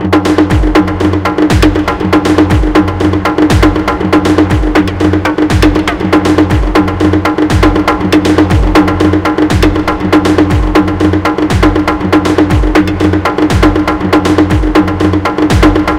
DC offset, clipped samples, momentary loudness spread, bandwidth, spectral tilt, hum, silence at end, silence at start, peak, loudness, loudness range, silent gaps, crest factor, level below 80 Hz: under 0.1%; 1%; 3 LU; 14.5 kHz; -6.5 dB/octave; none; 0 s; 0 s; 0 dBFS; -9 LUFS; 1 LU; none; 8 dB; -18 dBFS